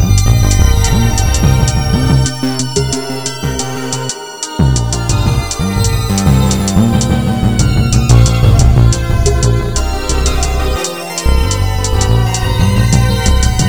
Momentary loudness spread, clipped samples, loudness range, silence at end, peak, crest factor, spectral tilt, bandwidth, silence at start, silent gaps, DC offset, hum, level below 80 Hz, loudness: 8 LU; 0.3%; 4 LU; 0 s; 0 dBFS; 10 dB; -5 dB/octave; over 20 kHz; 0 s; none; 1%; none; -16 dBFS; -12 LUFS